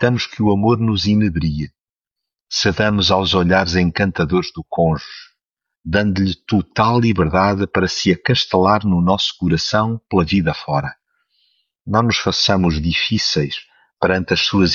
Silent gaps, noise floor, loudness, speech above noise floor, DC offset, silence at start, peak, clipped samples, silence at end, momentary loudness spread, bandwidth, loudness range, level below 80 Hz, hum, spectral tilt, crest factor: none; -84 dBFS; -17 LUFS; 68 dB; under 0.1%; 0 s; -2 dBFS; under 0.1%; 0 s; 8 LU; 7.2 kHz; 3 LU; -38 dBFS; none; -5.5 dB/octave; 16 dB